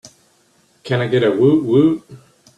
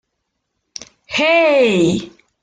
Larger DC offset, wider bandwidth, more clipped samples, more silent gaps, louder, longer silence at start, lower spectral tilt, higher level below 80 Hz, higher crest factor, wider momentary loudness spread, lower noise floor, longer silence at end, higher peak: neither; first, 10.5 kHz vs 9.4 kHz; neither; neither; about the same, -16 LUFS vs -14 LUFS; second, 0.05 s vs 1.1 s; first, -8 dB/octave vs -5 dB/octave; about the same, -58 dBFS vs -54 dBFS; about the same, 14 dB vs 14 dB; second, 9 LU vs 22 LU; second, -57 dBFS vs -74 dBFS; about the same, 0.4 s vs 0.35 s; about the same, -2 dBFS vs -2 dBFS